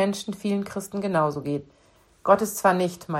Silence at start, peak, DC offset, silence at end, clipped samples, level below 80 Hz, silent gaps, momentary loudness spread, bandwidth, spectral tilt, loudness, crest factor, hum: 0 s; -6 dBFS; under 0.1%; 0 s; under 0.1%; -62 dBFS; none; 10 LU; 16 kHz; -5.5 dB/octave; -25 LUFS; 20 dB; none